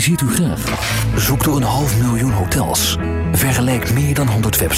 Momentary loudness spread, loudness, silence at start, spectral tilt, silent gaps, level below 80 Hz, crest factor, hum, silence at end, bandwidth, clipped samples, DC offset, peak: 3 LU; -16 LUFS; 0 s; -4.5 dB/octave; none; -28 dBFS; 12 dB; none; 0 s; 16.5 kHz; under 0.1%; under 0.1%; -4 dBFS